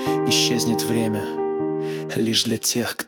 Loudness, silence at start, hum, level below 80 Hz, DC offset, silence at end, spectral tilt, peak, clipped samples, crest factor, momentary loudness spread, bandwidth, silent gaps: -21 LUFS; 0 s; none; -62 dBFS; under 0.1%; 0 s; -3.5 dB/octave; -4 dBFS; under 0.1%; 18 dB; 7 LU; 18 kHz; none